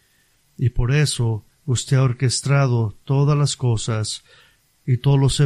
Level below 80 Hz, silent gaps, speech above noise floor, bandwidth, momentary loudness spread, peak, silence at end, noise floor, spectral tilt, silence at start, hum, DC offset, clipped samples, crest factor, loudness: -36 dBFS; none; 42 dB; 12 kHz; 7 LU; -4 dBFS; 0 s; -60 dBFS; -5.5 dB/octave; 0.6 s; none; under 0.1%; under 0.1%; 14 dB; -20 LUFS